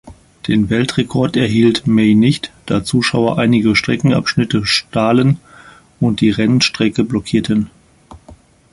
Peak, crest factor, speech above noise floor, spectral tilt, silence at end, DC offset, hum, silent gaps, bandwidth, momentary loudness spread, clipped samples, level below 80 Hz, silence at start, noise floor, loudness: 0 dBFS; 14 dB; 29 dB; -5.5 dB/octave; 0.4 s; under 0.1%; none; none; 11.5 kHz; 6 LU; under 0.1%; -42 dBFS; 0.05 s; -43 dBFS; -14 LUFS